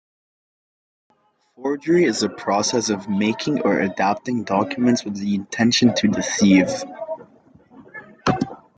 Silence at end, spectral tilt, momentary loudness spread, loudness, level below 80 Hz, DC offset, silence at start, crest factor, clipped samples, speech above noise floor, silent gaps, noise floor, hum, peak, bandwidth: 0.2 s; -4.5 dB/octave; 14 LU; -20 LUFS; -58 dBFS; under 0.1%; 1.6 s; 18 dB; under 0.1%; 32 dB; none; -51 dBFS; none; -4 dBFS; 9.2 kHz